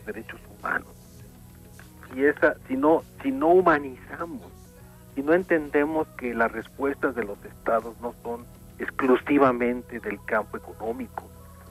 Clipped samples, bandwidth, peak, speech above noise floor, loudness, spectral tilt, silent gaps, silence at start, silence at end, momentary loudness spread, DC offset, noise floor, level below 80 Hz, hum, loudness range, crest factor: under 0.1%; 15.5 kHz; -6 dBFS; 23 dB; -25 LUFS; -7 dB/octave; none; 0 s; 0 s; 17 LU; under 0.1%; -48 dBFS; -52 dBFS; 60 Hz at -50 dBFS; 3 LU; 20 dB